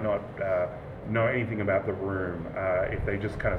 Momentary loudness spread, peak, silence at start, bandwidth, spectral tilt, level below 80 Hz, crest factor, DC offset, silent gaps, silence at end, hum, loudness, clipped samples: 5 LU; -14 dBFS; 0 s; 9.2 kHz; -9 dB/octave; -44 dBFS; 14 dB; under 0.1%; none; 0 s; none; -29 LUFS; under 0.1%